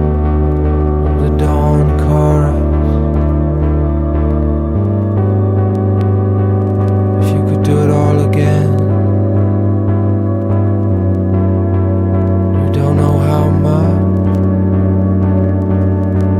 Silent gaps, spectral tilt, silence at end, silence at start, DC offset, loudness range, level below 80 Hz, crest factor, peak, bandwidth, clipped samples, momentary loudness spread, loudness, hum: none; -10 dB/octave; 0 s; 0 s; under 0.1%; 1 LU; -20 dBFS; 10 dB; 0 dBFS; 9.4 kHz; under 0.1%; 2 LU; -13 LUFS; none